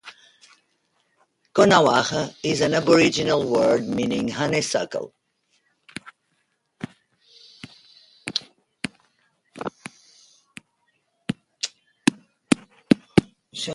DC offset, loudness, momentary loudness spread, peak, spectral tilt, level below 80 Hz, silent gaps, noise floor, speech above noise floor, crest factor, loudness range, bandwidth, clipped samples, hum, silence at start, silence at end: under 0.1%; -22 LUFS; 23 LU; 0 dBFS; -4.5 dB/octave; -56 dBFS; none; -71 dBFS; 52 dB; 24 dB; 17 LU; 11.5 kHz; under 0.1%; none; 0.05 s; 0 s